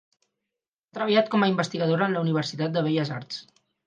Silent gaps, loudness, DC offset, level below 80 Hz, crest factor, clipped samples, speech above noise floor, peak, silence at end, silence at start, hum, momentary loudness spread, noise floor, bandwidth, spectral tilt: none; -25 LUFS; under 0.1%; -72 dBFS; 20 dB; under 0.1%; 63 dB; -6 dBFS; 0.45 s; 0.95 s; none; 13 LU; -87 dBFS; 9.2 kHz; -6.5 dB/octave